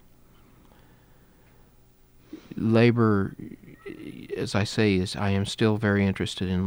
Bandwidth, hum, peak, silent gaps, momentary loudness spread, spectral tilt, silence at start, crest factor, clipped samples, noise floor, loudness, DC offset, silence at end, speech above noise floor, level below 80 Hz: over 20 kHz; 60 Hz at -50 dBFS; -8 dBFS; none; 22 LU; -6.5 dB/octave; 2.35 s; 20 dB; under 0.1%; -57 dBFS; -24 LUFS; under 0.1%; 0 s; 33 dB; -56 dBFS